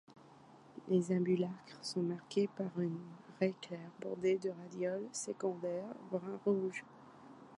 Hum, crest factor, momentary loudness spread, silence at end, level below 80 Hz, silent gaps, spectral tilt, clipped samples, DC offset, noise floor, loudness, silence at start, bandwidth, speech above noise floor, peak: none; 18 dB; 15 LU; 0 s; -82 dBFS; none; -6 dB/octave; under 0.1%; under 0.1%; -60 dBFS; -38 LUFS; 0.1 s; 11 kHz; 22 dB; -20 dBFS